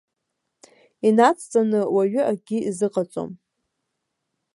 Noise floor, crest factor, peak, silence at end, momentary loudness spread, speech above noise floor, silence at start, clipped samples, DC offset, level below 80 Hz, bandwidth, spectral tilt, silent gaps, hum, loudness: -79 dBFS; 20 dB; -2 dBFS; 1.2 s; 11 LU; 58 dB; 1.05 s; under 0.1%; under 0.1%; -72 dBFS; 11.5 kHz; -6 dB/octave; none; none; -21 LUFS